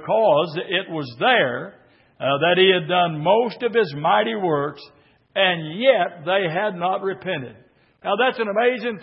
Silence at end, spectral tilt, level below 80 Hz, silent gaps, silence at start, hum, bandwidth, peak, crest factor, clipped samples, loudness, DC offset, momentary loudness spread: 0 s; -9.5 dB/octave; -70 dBFS; none; 0 s; none; 5.8 kHz; -4 dBFS; 18 dB; under 0.1%; -20 LUFS; under 0.1%; 11 LU